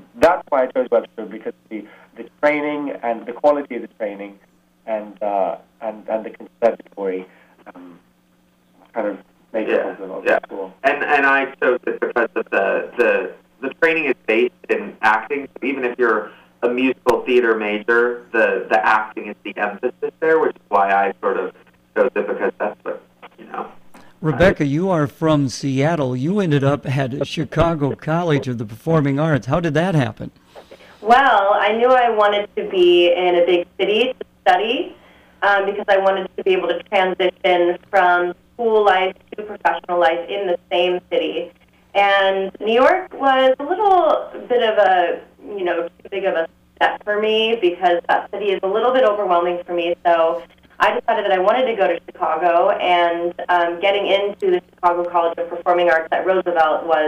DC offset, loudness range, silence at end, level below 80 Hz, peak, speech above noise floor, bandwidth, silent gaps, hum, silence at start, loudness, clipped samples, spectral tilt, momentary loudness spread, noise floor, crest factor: under 0.1%; 7 LU; 0 s; -50 dBFS; -4 dBFS; 40 dB; 13.5 kHz; none; none; 0.15 s; -18 LUFS; under 0.1%; -6 dB/octave; 12 LU; -58 dBFS; 14 dB